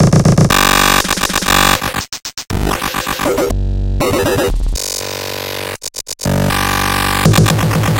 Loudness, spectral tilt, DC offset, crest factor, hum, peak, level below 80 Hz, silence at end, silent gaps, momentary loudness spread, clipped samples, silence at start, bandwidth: -14 LUFS; -4 dB/octave; under 0.1%; 14 dB; none; 0 dBFS; -24 dBFS; 0 s; none; 11 LU; under 0.1%; 0 s; 17.5 kHz